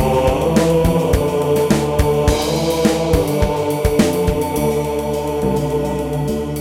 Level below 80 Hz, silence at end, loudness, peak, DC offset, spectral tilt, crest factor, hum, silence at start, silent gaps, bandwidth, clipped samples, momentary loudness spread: -26 dBFS; 0 s; -17 LUFS; -2 dBFS; under 0.1%; -6 dB/octave; 14 dB; none; 0 s; none; 17 kHz; under 0.1%; 5 LU